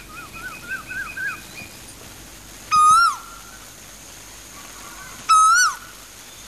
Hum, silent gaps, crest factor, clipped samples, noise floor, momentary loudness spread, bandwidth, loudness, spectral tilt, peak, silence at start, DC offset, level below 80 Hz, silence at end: none; none; 16 dB; under 0.1%; -41 dBFS; 25 LU; 14 kHz; -17 LUFS; 0.5 dB/octave; -6 dBFS; 0 s; 0.1%; -52 dBFS; 0 s